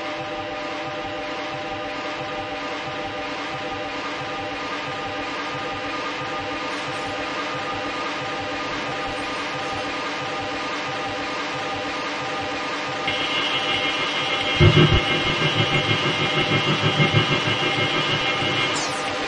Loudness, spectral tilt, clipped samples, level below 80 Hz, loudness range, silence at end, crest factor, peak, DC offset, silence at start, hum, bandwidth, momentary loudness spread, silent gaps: -23 LUFS; -4.5 dB/octave; under 0.1%; -44 dBFS; 9 LU; 0 s; 20 dB; -2 dBFS; under 0.1%; 0 s; none; 11 kHz; 9 LU; none